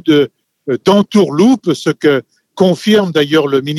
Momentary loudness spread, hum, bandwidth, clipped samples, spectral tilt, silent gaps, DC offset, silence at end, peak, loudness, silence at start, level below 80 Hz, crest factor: 7 LU; none; 14 kHz; under 0.1%; -6 dB/octave; none; under 0.1%; 0 s; 0 dBFS; -12 LUFS; 0.05 s; -58 dBFS; 12 dB